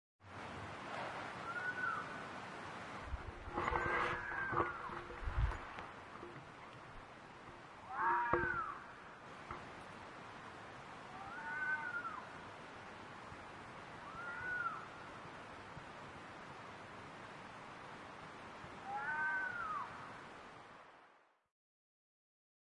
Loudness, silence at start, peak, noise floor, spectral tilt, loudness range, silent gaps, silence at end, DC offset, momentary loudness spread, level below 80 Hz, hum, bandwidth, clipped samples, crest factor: -44 LUFS; 0.2 s; -18 dBFS; -69 dBFS; -5 dB/octave; 8 LU; none; 1.45 s; under 0.1%; 16 LU; -56 dBFS; none; 11 kHz; under 0.1%; 26 dB